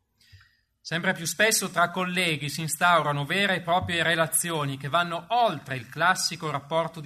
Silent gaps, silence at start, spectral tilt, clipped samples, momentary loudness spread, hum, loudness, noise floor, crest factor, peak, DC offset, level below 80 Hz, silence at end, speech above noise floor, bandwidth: none; 0.35 s; -3 dB/octave; under 0.1%; 8 LU; none; -25 LUFS; -59 dBFS; 20 dB; -8 dBFS; under 0.1%; -64 dBFS; 0 s; 34 dB; 13.5 kHz